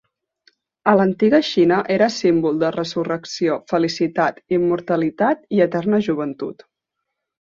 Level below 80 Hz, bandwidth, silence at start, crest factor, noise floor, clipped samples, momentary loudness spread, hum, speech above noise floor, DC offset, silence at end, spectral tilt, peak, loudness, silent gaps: -60 dBFS; 7.6 kHz; 0.85 s; 18 dB; -80 dBFS; under 0.1%; 8 LU; none; 61 dB; under 0.1%; 0.9 s; -6 dB/octave; -2 dBFS; -19 LUFS; none